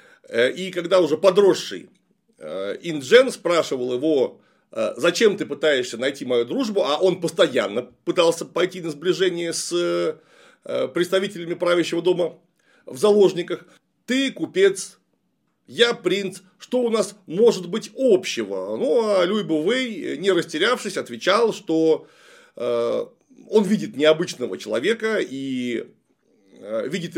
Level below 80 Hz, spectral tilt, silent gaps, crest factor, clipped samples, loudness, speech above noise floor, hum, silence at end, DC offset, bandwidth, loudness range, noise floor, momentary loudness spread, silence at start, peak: -78 dBFS; -4 dB/octave; none; 20 dB; under 0.1%; -21 LUFS; 50 dB; none; 0 s; under 0.1%; 16 kHz; 3 LU; -71 dBFS; 11 LU; 0.3 s; -2 dBFS